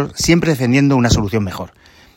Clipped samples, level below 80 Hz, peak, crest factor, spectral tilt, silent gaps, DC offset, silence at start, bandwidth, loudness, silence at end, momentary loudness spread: under 0.1%; -34 dBFS; 0 dBFS; 14 dB; -5.5 dB/octave; none; under 0.1%; 0 s; 16.5 kHz; -15 LUFS; 0.5 s; 14 LU